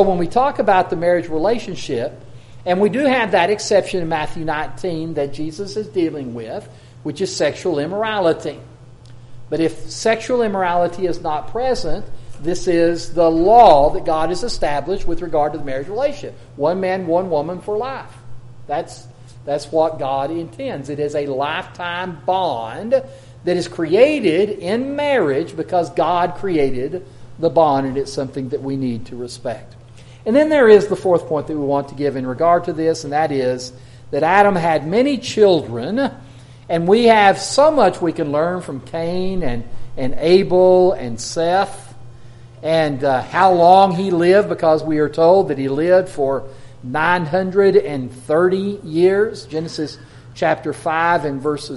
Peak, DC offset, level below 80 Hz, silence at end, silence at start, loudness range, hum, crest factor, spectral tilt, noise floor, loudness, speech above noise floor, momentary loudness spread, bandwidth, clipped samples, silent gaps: 0 dBFS; under 0.1%; -40 dBFS; 0 s; 0 s; 7 LU; none; 18 dB; -5.5 dB/octave; -40 dBFS; -17 LUFS; 23 dB; 14 LU; 11.5 kHz; under 0.1%; none